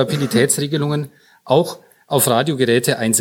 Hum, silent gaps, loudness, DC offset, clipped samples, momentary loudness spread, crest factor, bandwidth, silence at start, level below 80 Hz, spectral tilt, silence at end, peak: none; none; -17 LUFS; under 0.1%; under 0.1%; 9 LU; 16 dB; 18 kHz; 0 s; -62 dBFS; -4 dB/octave; 0 s; -2 dBFS